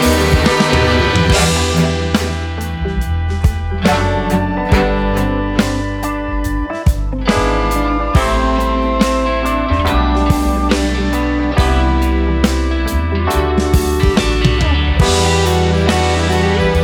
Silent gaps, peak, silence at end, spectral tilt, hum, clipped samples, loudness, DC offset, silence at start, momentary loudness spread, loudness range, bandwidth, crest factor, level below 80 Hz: none; 0 dBFS; 0 s; -5.5 dB/octave; none; under 0.1%; -15 LUFS; under 0.1%; 0 s; 6 LU; 3 LU; 19.5 kHz; 12 dB; -18 dBFS